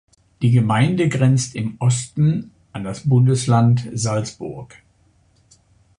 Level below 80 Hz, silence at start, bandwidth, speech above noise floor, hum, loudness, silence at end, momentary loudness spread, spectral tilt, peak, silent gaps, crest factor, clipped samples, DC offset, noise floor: -52 dBFS; 0.4 s; 10.5 kHz; 40 dB; none; -18 LUFS; 1.35 s; 15 LU; -6.5 dB/octave; -2 dBFS; none; 16 dB; under 0.1%; under 0.1%; -58 dBFS